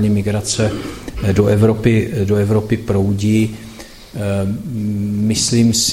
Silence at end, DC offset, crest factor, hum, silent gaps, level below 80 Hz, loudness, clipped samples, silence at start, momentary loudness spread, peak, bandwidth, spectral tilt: 0 s; under 0.1%; 16 dB; none; none; -38 dBFS; -16 LUFS; under 0.1%; 0 s; 12 LU; 0 dBFS; 15.5 kHz; -5.5 dB/octave